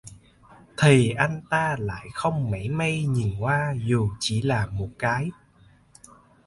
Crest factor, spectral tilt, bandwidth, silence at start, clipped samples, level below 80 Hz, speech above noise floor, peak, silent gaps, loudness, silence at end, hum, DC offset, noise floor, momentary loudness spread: 20 dB; -6 dB/octave; 11.5 kHz; 0.05 s; under 0.1%; -48 dBFS; 33 dB; -4 dBFS; none; -24 LUFS; 1.15 s; none; under 0.1%; -56 dBFS; 10 LU